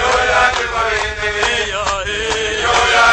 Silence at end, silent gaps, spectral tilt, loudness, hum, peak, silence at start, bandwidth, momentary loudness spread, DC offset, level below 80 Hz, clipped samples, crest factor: 0 s; none; -1.5 dB/octave; -15 LUFS; none; -2 dBFS; 0 s; 9.6 kHz; 6 LU; under 0.1%; -32 dBFS; under 0.1%; 14 dB